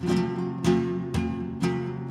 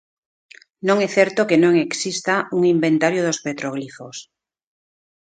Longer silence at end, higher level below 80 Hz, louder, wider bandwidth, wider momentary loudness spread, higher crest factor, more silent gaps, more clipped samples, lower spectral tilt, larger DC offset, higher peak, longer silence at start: second, 0 s vs 1.1 s; first, -46 dBFS vs -66 dBFS; second, -27 LUFS vs -19 LUFS; first, 13 kHz vs 9.2 kHz; second, 5 LU vs 16 LU; about the same, 16 dB vs 20 dB; neither; neither; first, -7 dB/octave vs -4.5 dB/octave; neither; second, -10 dBFS vs 0 dBFS; second, 0 s vs 0.85 s